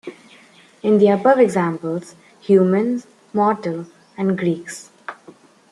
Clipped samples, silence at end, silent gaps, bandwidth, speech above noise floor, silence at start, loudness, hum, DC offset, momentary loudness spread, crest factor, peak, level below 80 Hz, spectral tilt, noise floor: under 0.1%; 0.6 s; none; 12 kHz; 32 dB; 0.05 s; -18 LUFS; none; under 0.1%; 21 LU; 18 dB; -2 dBFS; -68 dBFS; -7 dB/octave; -49 dBFS